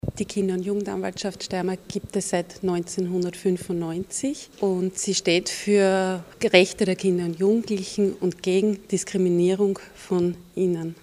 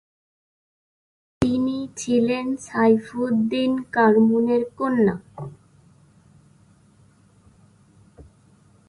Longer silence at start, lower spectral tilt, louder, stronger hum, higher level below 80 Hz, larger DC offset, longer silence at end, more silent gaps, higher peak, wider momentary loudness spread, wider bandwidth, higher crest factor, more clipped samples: second, 0.05 s vs 1.4 s; about the same, -5 dB/octave vs -6 dB/octave; second, -24 LUFS vs -21 LUFS; neither; about the same, -54 dBFS vs -54 dBFS; neither; second, 0.1 s vs 0.65 s; neither; first, 0 dBFS vs -4 dBFS; about the same, 9 LU vs 11 LU; first, 14.5 kHz vs 11.5 kHz; about the same, 24 dB vs 20 dB; neither